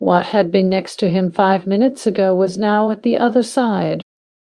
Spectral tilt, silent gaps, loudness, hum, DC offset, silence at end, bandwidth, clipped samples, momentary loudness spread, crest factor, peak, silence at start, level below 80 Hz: -6.5 dB/octave; none; -16 LUFS; none; under 0.1%; 0.55 s; 12 kHz; under 0.1%; 3 LU; 16 dB; 0 dBFS; 0 s; -60 dBFS